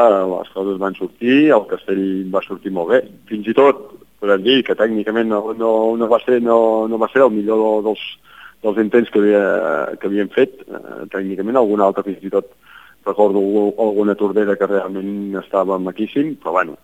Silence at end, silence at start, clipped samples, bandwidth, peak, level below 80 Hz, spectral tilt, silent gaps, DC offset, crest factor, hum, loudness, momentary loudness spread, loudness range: 0.1 s; 0 s; under 0.1%; 14 kHz; 0 dBFS; -62 dBFS; -7 dB/octave; none; 0.2%; 16 dB; none; -17 LUFS; 10 LU; 3 LU